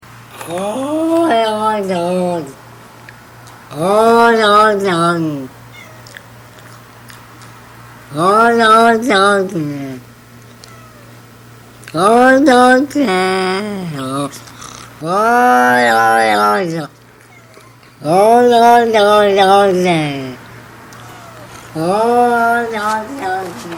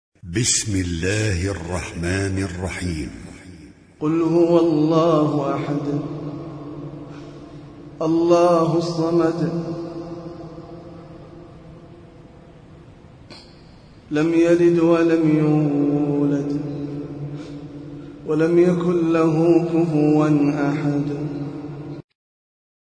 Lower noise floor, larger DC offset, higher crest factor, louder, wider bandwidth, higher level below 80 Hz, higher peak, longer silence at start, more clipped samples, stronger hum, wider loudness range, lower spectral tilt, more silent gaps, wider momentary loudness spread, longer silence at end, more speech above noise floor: about the same, -42 dBFS vs -45 dBFS; neither; about the same, 14 dB vs 18 dB; first, -12 LUFS vs -20 LUFS; first, 19.5 kHz vs 10.5 kHz; second, -52 dBFS vs -46 dBFS; first, 0 dBFS vs -4 dBFS; about the same, 0.15 s vs 0.25 s; first, 0.2% vs under 0.1%; neither; about the same, 6 LU vs 8 LU; about the same, -5 dB/octave vs -6 dB/octave; neither; about the same, 22 LU vs 21 LU; second, 0 s vs 0.95 s; about the same, 30 dB vs 27 dB